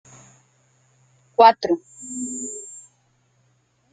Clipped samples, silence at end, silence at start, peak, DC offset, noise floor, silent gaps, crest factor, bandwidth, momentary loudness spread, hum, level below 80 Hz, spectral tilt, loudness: under 0.1%; 1.15 s; 1.4 s; -2 dBFS; under 0.1%; -64 dBFS; none; 22 dB; 9.6 kHz; 22 LU; none; -68 dBFS; -2.5 dB/octave; -20 LUFS